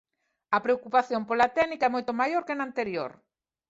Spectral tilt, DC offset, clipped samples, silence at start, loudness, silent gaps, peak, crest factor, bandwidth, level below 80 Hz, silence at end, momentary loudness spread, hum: -5 dB/octave; under 0.1%; under 0.1%; 0.5 s; -27 LUFS; none; -8 dBFS; 20 dB; 7.8 kHz; -68 dBFS; 0.55 s; 7 LU; none